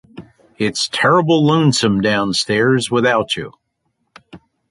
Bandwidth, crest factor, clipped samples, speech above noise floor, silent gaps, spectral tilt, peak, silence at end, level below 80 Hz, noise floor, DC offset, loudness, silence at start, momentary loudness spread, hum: 11.5 kHz; 16 dB; under 0.1%; 54 dB; none; -5 dB/octave; -2 dBFS; 0.35 s; -52 dBFS; -69 dBFS; under 0.1%; -15 LUFS; 0.15 s; 9 LU; none